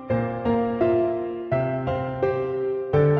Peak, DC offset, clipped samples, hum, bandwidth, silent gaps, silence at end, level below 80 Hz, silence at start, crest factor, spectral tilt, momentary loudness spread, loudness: -8 dBFS; under 0.1%; under 0.1%; none; 5.8 kHz; none; 0 s; -48 dBFS; 0 s; 16 dB; -10.5 dB/octave; 5 LU; -24 LUFS